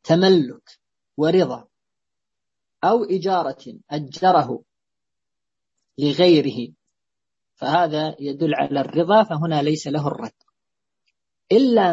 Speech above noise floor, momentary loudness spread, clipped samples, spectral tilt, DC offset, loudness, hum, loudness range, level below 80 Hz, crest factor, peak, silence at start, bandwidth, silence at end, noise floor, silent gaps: 69 dB; 16 LU; under 0.1%; -6.5 dB/octave; under 0.1%; -20 LUFS; none; 2 LU; -66 dBFS; 18 dB; -4 dBFS; 0.05 s; 8 kHz; 0 s; -87 dBFS; none